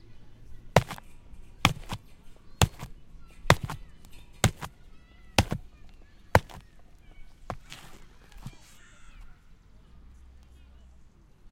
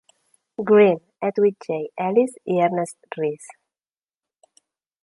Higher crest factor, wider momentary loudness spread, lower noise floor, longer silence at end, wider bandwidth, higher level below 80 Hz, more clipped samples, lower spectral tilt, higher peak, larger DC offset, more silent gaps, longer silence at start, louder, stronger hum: first, 32 dB vs 18 dB; first, 23 LU vs 15 LU; second, -54 dBFS vs under -90 dBFS; second, 0.05 s vs 1.55 s; first, 16.5 kHz vs 11.5 kHz; first, -44 dBFS vs -72 dBFS; neither; second, -4.5 dB/octave vs -6.5 dB/octave; first, 0 dBFS vs -4 dBFS; neither; neither; second, 0.05 s vs 0.6 s; second, -28 LUFS vs -21 LUFS; neither